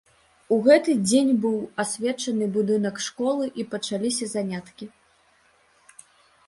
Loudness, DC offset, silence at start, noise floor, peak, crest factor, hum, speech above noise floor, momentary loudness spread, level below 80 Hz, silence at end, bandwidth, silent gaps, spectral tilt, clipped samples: -23 LUFS; under 0.1%; 0.5 s; -61 dBFS; -6 dBFS; 20 dB; none; 38 dB; 13 LU; -68 dBFS; 1.6 s; 11.5 kHz; none; -4.5 dB/octave; under 0.1%